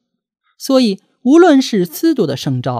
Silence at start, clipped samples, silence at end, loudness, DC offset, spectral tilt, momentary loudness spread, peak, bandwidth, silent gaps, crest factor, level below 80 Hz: 0.6 s; under 0.1%; 0 s; -13 LUFS; under 0.1%; -6 dB/octave; 10 LU; 0 dBFS; 16 kHz; none; 14 dB; -64 dBFS